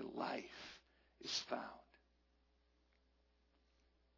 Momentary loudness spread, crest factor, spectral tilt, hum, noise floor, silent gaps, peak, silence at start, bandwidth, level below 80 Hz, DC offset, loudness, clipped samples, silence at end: 17 LU; 24 dB; -1 dB/octave; none; -78 dBFS; none; -28 dBFS; 0 s; 6 kHz; -78 dBFS; under 0.1%; -46 LUFS; under 0.1%; 2.2 s